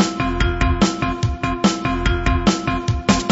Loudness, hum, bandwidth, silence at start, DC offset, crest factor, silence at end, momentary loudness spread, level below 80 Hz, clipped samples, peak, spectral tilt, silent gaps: -19 LUFS; none; 8.2 kHz; 0 s; under 0.1%; 16 dB; 0 s; 4 LU; -26 dBFS; under 0.1%; -2 dBFS; -5 dB/octave; none